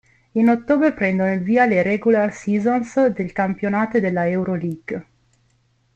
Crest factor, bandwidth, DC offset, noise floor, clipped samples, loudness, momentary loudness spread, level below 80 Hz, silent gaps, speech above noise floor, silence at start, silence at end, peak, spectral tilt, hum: 16 dB; 8.2 kHz; under 0.1%; -62 dBFS; under 0.1%; -19 LUFS; 9 LU; -56 dBFS; none; 44 dB; 0.35 s; 0.95 s; -4 dBFS; -8 dB/octave; none